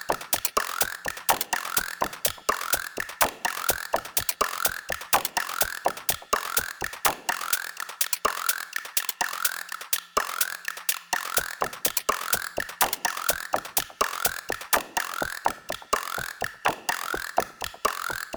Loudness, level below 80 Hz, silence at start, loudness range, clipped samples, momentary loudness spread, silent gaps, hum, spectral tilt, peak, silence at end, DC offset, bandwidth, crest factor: -26 LUFS; -56 dBFS; 0 s; 2 LU; under 0.1%; 5 LU; none; none; -0.5 dB/octave; -6 dBFS; 0 s; under 0.1%; over 20 kHz; 24 dB